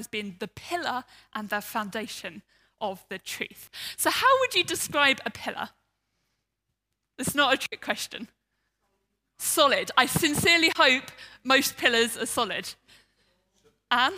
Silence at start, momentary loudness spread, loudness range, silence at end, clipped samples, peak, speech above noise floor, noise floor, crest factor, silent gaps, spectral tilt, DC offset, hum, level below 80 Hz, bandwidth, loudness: 0 s; 17 LU; 10 LU; 0 s; under 0.1%; -4 dBFS; 55 dB; -82 dBFS; 24 dB; none; -2 dB/octave; under 0.1%; none; -64 dBFS; 16 kHz; -25 LUFS